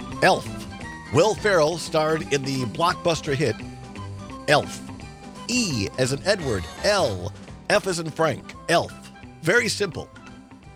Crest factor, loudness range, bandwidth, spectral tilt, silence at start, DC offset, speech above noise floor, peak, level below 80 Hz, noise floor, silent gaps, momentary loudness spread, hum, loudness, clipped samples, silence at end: 22 dB; 3 LU; 16.5 kHz; -4 dB/octave; 0 s; under 0.1%; 21 dB; -2 dBFS; -48 dBFS; -44 dBFS; none; 16 LU; none; -23 LUFS; under 0.1%; 0 s